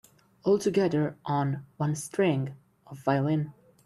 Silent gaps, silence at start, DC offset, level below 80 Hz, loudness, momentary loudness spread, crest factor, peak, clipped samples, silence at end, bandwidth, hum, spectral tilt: none; 0.45 s; under 0.1%; -66 dBFS; -28 LUFS; 8 LU; 18 dB; -10 dBFS; under 0.1%; 0.35 s; 13 kHz; none; -7 dB/octave